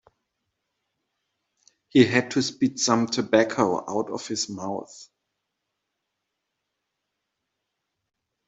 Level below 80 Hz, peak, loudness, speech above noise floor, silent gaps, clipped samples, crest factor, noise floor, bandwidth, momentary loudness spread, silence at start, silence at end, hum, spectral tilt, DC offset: -68 dBFS; -4 dBFS; -23 LUFS; 58 dB; none; under 0.1%; 24 dB; -81 dBFS; 8.2 kHz; 12 LU; 1.95 s; 3.45 s; none; -4 dB/octave; under 0.1%